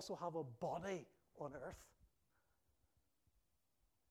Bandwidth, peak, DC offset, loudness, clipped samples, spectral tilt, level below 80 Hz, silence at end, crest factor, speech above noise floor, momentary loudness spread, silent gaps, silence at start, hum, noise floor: 16 kHz; -32 dBFS; under 0.1%; -49 LUFS; under 0.1%; -5.5 dB/octave; -76 dBFS; 2.05 s; 18 dB; 36 dB; 12 LU; none; 0 s; none; -85 dBFS